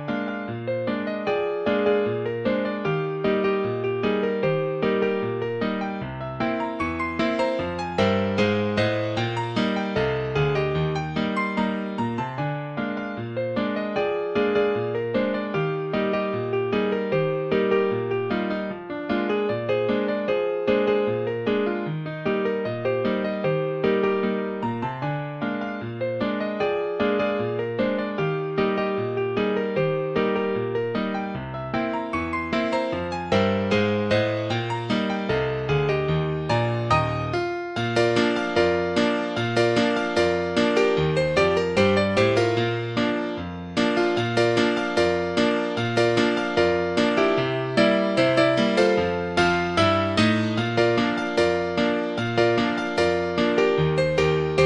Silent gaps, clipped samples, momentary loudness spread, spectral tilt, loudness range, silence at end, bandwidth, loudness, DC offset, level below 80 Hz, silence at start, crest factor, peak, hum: none; under 0.1%; 7 LU; -6.5 dB/octave; 5 LU; 0 s; 10.5 kHz; -24 LUFS; under 0.1%; -50 dBFS; 0 s; 16 dB; -6 dBFS; none